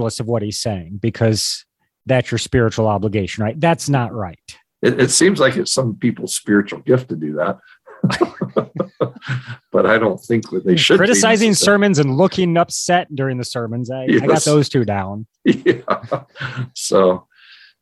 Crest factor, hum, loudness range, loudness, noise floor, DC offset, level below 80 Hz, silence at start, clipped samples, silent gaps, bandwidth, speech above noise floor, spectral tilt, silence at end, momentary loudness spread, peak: 16 dB; none; 6 LU; -17 LUFS; -47 dBFS; under 0.1%; -46 dBFS; 0 s; under 0.1%; none; 13 kHz; 30 dB; -4.5 dB/octave; 0.6 s; 12 LU; -2 dBFS